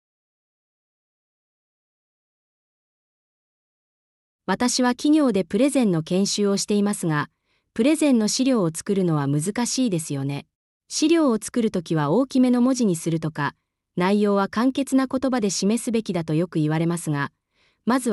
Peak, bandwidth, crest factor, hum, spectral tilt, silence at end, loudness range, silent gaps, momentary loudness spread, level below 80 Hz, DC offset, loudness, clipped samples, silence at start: -8 dBFS; 12 kHz; 14 dB; none; -5 dB/octave; 0 s; 2 LU; 10.55-10.80 s; 9 LU; -62 dBFS; under 0.1%; -22 LUFS; under 0.1%; 4.5 s